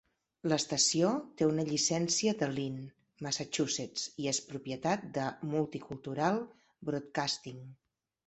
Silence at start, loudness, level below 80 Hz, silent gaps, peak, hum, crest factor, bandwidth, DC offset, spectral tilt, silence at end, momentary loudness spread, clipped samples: 0.45 s; -33 LUFS; -70 dBFS; none; -14 dBFS; none; 20 dB; 8.6 kHz; under 0.1%; -3.5 dB/octave; 0.5 s; 13 LU; under 0.1%